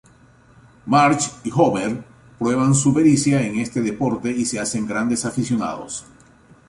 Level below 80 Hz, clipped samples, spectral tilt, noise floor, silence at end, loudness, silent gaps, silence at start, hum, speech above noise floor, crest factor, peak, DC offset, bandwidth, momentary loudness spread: -52 dBFS; under 0.1%; -5 dB/octave; -51 dBFS; 0.65 s; -19 LUFS; none; 0.85 s; none; 32 dB; 18 dB; -2 dBFS; under 0.1%; 11.5 kHz; 11 LU